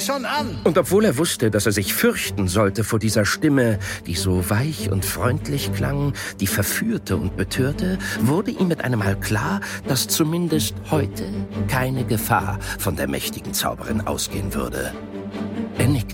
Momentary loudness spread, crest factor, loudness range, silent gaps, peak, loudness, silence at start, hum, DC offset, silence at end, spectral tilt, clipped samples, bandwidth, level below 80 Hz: 7 LU; 18 dB; 4 LU; none; -4 dBFS; -22 LUFS; 0 s; none; under 0.1%; 0 s; -5 dB/octave; under 0.1%; 17 kHz; -40 dBFS